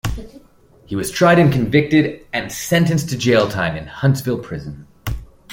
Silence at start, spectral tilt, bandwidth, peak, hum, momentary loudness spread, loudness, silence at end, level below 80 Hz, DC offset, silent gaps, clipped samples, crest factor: 0.05 s; -6 dB/octave; 17 kHz; -2 dBFS; none; 16 LU; -17 LUFS; 0 s; -38 dBFS; under 0.1%; none; under 0.1%; 16 dB